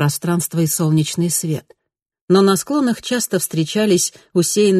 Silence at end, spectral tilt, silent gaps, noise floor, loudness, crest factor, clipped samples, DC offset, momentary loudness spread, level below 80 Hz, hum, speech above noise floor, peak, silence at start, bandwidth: 0 s; -5 dB/octave; 2.02-2.06 s, 2.21-2.28 s; -80 dBFS; -17 LUFS; 16 dB; under 0.1%; under 0.1%; 5 LU; -58 dBFS; none; 63 dB; -2 dBFS; 0 s; 13 kHz